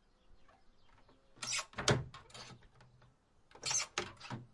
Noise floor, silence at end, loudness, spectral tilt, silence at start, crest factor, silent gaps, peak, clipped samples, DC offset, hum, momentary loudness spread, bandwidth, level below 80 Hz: -68 dBFS; 0.1 s; -37 LUFS; -2.5 dB/octave; 0.3 s; 30 dB; none; -12 dBFS; under 0.1%; under 0.1%; none; 18 LU; 11.5 kHz; -64 dBFS